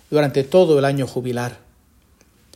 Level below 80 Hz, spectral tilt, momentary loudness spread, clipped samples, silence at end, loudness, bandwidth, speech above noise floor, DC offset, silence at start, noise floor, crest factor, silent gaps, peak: -56 dBFS; -6.5 dB/octave; 11 LU; under 0.1%; 1 s; -18 LUFS; 16.5 kHz; 38 dB; under 0.1%; 0.1 s; -55 dBFS; 18 dB; none; -2 dBFS